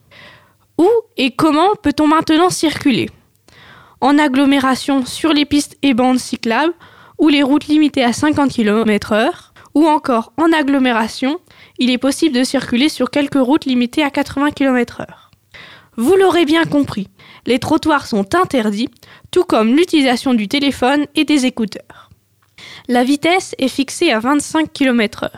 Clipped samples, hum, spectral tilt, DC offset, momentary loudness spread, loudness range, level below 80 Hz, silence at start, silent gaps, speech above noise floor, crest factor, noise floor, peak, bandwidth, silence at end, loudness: under 0.1%; none; -4 dB/octave; under 0.1%; 7 LU; 2 LU; -48 dBFS; 0.25 s; none; 38 dB; 12 dB; -52 dBFS; -2 dBFS; 15 kHz; 0 s; -15 LUFS